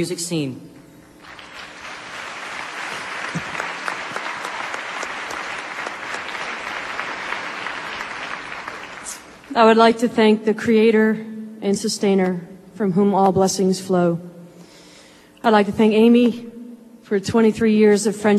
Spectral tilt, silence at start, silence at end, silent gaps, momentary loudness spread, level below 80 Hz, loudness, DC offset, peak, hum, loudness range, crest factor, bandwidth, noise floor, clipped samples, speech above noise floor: -5 dB/octave; 0 s; 0 s; none; 18 LU; -58 dBFS; -20 LUFS; under 0.1%; -2 dBFS; none; 11 LU; 18 dB; 13 kHz; -47 dBFS; under 0.1%; 31 dB